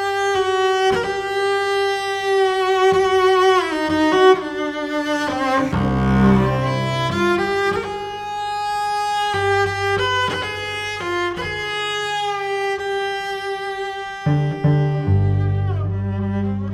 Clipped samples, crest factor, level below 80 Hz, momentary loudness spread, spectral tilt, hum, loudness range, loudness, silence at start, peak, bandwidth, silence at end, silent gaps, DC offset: under 0.1%; 16 dB; -40 dBFS; 9 LU; -6 dB/octave; none; 6 LU; -19 LUFS; 0 s; -2 dBFS; 14 kHz; 0 s; none; under 0.1%